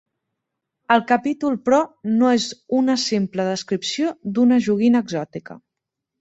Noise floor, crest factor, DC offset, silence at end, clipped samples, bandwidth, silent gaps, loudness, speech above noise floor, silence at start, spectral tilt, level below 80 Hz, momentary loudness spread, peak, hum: -82 dBFS; 18 dB; under 0.1%; 0.65 s; under 0.1%; 8 kHz; none; -20 LUFS; 63 dB; 0.9 s; -5 dB/octave; -64 dBFS; 7 LU; -2 dBFS; none